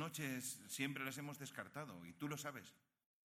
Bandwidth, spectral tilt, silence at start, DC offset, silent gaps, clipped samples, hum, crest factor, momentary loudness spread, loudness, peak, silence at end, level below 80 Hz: 17.5 kHz; -3.5 dB/octave; 0 s; under 0.1%; none; under 0.1%; none; 22 dB; 9 LU; -47 LUFS; -28 dBFS; 0.5 s; -88 dBFS